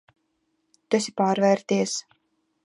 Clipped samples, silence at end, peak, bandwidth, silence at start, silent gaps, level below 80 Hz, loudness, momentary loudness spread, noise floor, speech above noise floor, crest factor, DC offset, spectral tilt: under 0.1%; 0.65 s; -6 dBFS; 11.5 kHz; 0.9 s; none; -76 dBFS; -24 LUFS; 7 LU; -73 dBFS; 51 dB; 20 dB; under 0.1%; -4.5 dB/octave